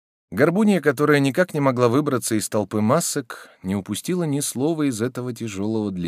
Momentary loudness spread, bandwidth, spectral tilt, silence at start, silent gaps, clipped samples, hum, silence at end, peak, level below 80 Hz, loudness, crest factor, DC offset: 10 LU; 16 kHz; -5.5 dB/octave; 0.3 s; none; under 0.1%; none; 0 s; -2 dBFS; -66 dBFS; -21 LUFS; 18 dB; under 0.1%